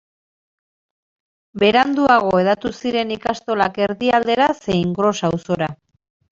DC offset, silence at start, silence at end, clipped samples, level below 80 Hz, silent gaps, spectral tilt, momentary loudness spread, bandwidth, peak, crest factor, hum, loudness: under 0.1%; 1.55 s; 0.65 s; under 0.1%; -52 dBFS; none; -5.5 dB/octave; 8 LU; 7.8 kHz; -2 dBFS; 18 dB; none; -18 LUFS